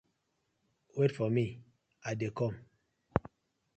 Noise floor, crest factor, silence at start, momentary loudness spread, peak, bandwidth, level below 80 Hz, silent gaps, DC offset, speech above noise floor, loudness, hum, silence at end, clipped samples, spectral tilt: -80 dBFS; 28 dB; 0.95 s; 13 LU; -8 dBFS; 8.6 kHz; -58 dBFS; none; under 0.1%; 48 dB; -35 LUFS; none; 0.6 s; under 0.1%; -7.5 dB/octave